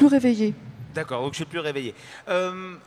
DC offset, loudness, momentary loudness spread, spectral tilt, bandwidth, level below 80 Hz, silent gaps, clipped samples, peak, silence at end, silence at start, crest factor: under 0.1%; -26 LUFS; 15 LU; -6 dB/octave; 11.5 kHz; -62 dBFS; none; under 0.1%; -6 dBFS; 0.05 s; 0 s; 18 dB